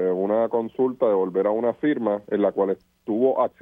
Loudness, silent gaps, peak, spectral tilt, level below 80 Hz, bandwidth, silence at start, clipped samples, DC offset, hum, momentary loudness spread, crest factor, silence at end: -23 LUFS; none; -8 dBFS; -9.5 dB/octave; -68 dBFS; 3.8 kHz; 0 s; under 0.1%; under 0.1%; none; 4 LU; 14 dB; 0.15 s